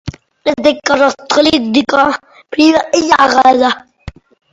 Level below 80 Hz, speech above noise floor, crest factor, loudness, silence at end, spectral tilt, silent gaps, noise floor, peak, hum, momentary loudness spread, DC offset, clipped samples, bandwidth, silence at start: -42 dBFS; 23 dB; 12 dB; -11 LUFS; 0.45 s; -3.5 dB/octave; none; -33 dBFS; 0 dBFS; none; 11 LU; under 0.1%; 0.1%; 9 kHz; 0.05 s